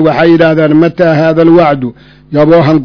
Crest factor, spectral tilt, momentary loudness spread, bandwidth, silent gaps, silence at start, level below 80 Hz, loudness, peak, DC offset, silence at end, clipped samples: 6 dB; -9 dB/octave; 8 LU; 5.4 kHz; none; 0 s; -40 dBFS; -7 LUFS; 0 dBFS; 0.4%; 0 s; 6%